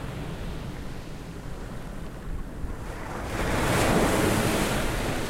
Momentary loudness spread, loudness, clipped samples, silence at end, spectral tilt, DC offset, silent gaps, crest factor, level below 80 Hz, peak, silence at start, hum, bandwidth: 16 LU; -28 LUFS; under 0.1%; 0 s; -5 dB/octave; under 0.1%; none; 18 dB; -36 dBFS; -10 dBFS; 0 s; none; 16 kHz